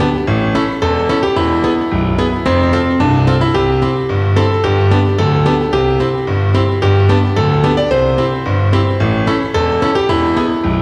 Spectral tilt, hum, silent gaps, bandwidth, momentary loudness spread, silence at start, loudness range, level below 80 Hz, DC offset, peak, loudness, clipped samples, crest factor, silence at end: -7.5 dB/octave; none; none; 8.4 kHz; 3 LU; 0 s; 1 LU; -30 dBFS; under 0.1%; 0 dBFS; -14 LUFS; under 0.1%; 12 dB; 0 s